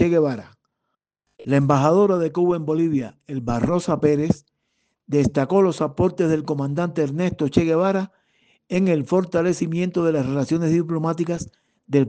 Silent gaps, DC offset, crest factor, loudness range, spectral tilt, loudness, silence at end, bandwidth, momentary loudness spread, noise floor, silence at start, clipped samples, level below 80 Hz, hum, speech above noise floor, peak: none; under 0.1%; 18 dB; 2 LU; -7.5 dB/octave; -21 LUFS; 0 s; 9.4 kHz; 8 LU; -78 dBFS; 0 s; under 0.1%; -52 dBFS; none; 58 dB; -2 dBFS